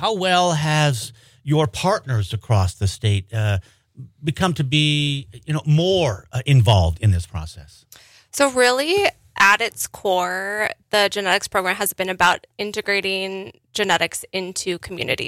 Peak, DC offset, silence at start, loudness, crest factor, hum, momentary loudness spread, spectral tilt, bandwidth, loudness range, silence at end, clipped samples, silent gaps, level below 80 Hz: -4 dBFS; under 0.1%; 0 s; -20 LUFS; 18 dB; none; 11 LU; -4.5 dB/octave; 16 kHz; 3 LU; 0 s; under 0.1%; none; -42 dBFS